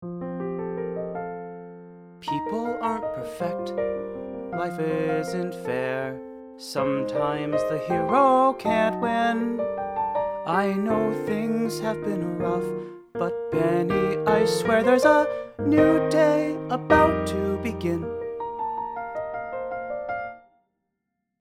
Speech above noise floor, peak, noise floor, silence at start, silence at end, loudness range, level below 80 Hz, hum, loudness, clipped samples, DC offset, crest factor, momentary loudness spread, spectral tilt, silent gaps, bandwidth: 57 dB; -4 dBFS; -80 dBFS; 0 s; 1.05 s; 10 LU; -52 dBFS; none; -25 LUFS; under 0.1%; under 0.1%; 20 dB; 13 LU; -6.5 dB/octave; none; 16 kHz